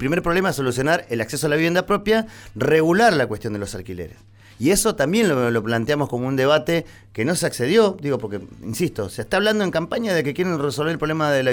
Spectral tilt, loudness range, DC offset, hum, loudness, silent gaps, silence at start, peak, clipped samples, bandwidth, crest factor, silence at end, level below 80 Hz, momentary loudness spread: -5 dB/octave; 2 LU; under 0.1%; none; -20 LUFS; none; 0 s; -6 dBFS; under 0.1%; 19.5 kHz; 16 dB; 0 s; -46 dBFS; 11 LU